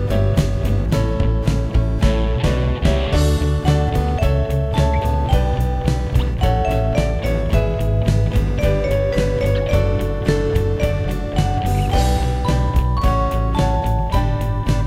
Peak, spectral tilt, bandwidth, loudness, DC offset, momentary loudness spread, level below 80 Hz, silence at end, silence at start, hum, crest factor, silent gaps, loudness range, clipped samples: -2 dBFS; -7 dB/octave; 15.5 kHz; -19 LUFS; under 0.1%; 2 LU; -20 dBFS; 0 s; 0 s; none; 16 dB; none; 1 LU; under 0.1%